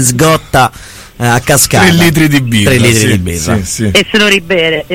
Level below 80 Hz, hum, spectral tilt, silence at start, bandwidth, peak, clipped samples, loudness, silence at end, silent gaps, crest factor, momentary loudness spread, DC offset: -30 dBFS; none; -4 dB/octave; 0 s; over 20 kHz; 0 dBFS; 0.2%; -8 LUFS; 0 s; none; 8 dB; 7 LU; under 0.1%